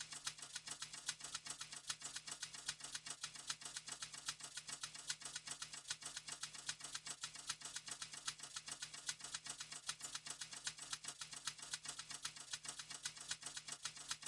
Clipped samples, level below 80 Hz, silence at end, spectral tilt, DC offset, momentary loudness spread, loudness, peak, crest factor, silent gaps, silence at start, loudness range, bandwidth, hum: under 0.1%; -80 dBFS; 0 s; 1 dB/octave; under 0.1%; 2 LU; -48 LUFS; -26 dBFS; 26 dB; none; 0 s; 0 LU; 12 kHz; none